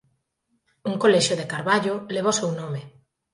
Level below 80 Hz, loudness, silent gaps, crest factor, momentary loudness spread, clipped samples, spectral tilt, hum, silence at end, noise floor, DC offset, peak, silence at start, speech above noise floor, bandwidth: -68 dBFS; -23 LUFS; none; 20 dB; 14 LU; under 0.1%; -4 dB/octave; none; 0.45 s; -73 dBFS; under 0.1%; -6 dBFS; 0.85 s; 50 dB; 11.5 kHz